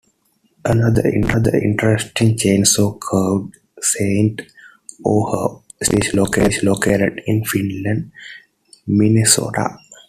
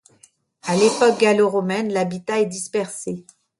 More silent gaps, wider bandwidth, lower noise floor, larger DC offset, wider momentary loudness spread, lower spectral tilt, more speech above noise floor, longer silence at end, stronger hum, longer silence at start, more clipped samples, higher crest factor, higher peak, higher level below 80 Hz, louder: neither; first, 15 kHz vs 11.5 kHz; first, -62 dBFS vs -56 dBFS; neither; second, 11 LU vs 14 LU; about the same, -4.5 dB/octave vs -4.5 dB/octave; first, 45 dB vs 37 dB; second, 0.15 s vs 0.4 s; neither; about the same, 0.65 s vs 0.65 s; neither; about the same, 18 dB vs 18 dB; first, 0 dBFS vs -4 dBFS; first, -42 dBFS vs -66 dBFS; first, -17 LUFS vs -20 LUFS